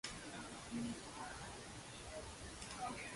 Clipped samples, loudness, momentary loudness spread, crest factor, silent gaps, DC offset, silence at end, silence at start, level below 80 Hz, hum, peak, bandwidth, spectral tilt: under 0.1%; -49 LUFS; 6 LU; 18 dB; none; under 0.1%; 0 s; 0.05 s; -62 dBFS; none; -30 dBFS; 11.5 kHz; -3.5 dB/octave